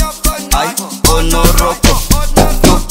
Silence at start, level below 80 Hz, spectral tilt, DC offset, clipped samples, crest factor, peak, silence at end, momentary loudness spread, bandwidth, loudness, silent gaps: 0 s; -14 dBFS; -4 dB/octave; under 0.1%; 0.3%; 10 dB; 0 dBFS; 0 s; 5 LU; 16.5 kHz; -11 LUFS; none